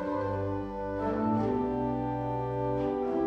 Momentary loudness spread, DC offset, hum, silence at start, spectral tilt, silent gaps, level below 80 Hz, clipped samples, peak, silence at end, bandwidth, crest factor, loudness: 5 LU; under 0.1%; none; 0 s; -9.5 dB/octave; none; -50 dBFS; under 0.1%; -18 dBFS; 0 s; 7 kHz; 12 dB; -31 LUFS